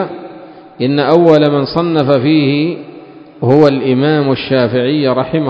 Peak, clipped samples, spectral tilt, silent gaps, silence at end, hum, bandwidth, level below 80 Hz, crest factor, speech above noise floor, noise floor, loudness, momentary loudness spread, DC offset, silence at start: 0 dBFS; 0.4%; -8.5 dB/octave; none; 0 s; none; 6.8 kHz; -50 dBFS; 12 dB; 24 dB; -34 dBFS; -12 LUFS; 10 LU; under 0.1%; 0 s